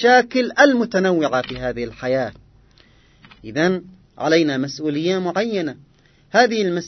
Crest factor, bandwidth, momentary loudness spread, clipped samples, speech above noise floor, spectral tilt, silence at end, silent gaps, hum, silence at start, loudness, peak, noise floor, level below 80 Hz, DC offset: 20 dB; 6.4 kHz; 12 LU; under 0.1%; 34 dB; -5 dB/octave; 0 s; none; none; 0 s; -19 LUFS; 0 dBFS; -52 dBFS; -52 dBFS; under 0.1%